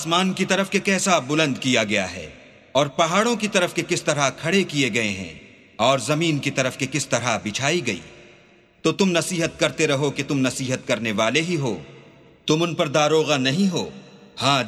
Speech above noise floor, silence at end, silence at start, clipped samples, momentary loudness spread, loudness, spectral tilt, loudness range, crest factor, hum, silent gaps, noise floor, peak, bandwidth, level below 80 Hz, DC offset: 32 dB; 0 s; 0 s; under 0.1%; 7 LU; -21 LUFS; -4 dB/octave; 2 LU; 20 dB; none; none; -53 dBFS; -2 dBFS; 14 kHz; -58 dBFS; under 0.1%